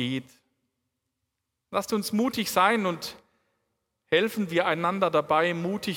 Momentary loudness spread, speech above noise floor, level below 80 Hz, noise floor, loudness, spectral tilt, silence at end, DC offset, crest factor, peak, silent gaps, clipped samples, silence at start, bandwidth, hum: 9 LU; 56 dB; -70 dBFS; -82 dBFS; -26 LUFS; -4.5 dB/octave; 0 s; under 0.1%; 22 dB; -6 dBFS; none; under 0.1%; 0 s; 18 kHz; none